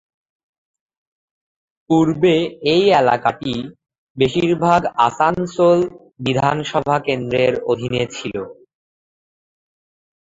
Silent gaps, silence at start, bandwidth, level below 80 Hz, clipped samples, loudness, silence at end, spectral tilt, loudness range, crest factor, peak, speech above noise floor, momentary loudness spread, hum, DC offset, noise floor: 3.98-4.15 s; 1.9 s; 7.8 kHz; -52 dBFS; under 0.1%; -17 LUFS; 1.75 s; -6 dB/octave; 5 LU; 18 dB; -2 dBFS; over 73 dB; 11 LU; none; under 0.1%; under -90 dBFS